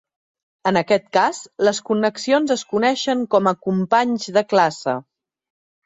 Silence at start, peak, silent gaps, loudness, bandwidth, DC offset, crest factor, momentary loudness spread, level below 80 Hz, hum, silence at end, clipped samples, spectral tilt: 0.65 s; -2 dBFS; none; -19 LUFS; 8.2 kHz; under 0.1%; 18 dB; 4 LU; -66 dBFS; none; 0.85 s; under 0.1%; -4.5 dB/octave